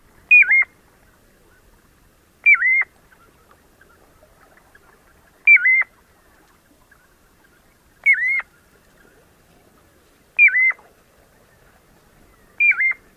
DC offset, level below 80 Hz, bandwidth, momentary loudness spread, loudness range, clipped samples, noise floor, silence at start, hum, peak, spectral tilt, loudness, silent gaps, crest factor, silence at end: under 0.1%; -60 dBFS; 15 kHz; 13 LU; 6 LU; under 0.1%; -55 dBFS; 0.3 s; none; -4 dBFS; -2 dB/octave; -14 LUFS; none; 18 dB; 0.25 s